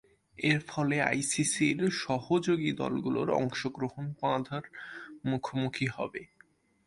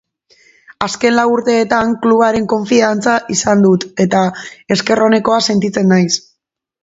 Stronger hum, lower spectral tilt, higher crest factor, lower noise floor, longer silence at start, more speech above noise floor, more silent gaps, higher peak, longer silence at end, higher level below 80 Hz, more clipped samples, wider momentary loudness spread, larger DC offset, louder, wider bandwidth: neither; about the same, -4.5 dB/octave vs -4.5 dB/octave; first, 20 dB vs 14 dB; second, -64 dBFS vs -69 dBFS; second, 0.4 s vs 0.8 s; second, 34 dB vs 57 dB; neither; second, -12 dBFS vs 0 dBFS; about the same, 0.6 s vs 0.65 s; second, -66 dBFS vs -50 dBFS; neither; first, 11 LU vs 6 LU; neither; second, -31 LUFS vs -13 LUFS; first, 11.5 kHz vs 8 kHz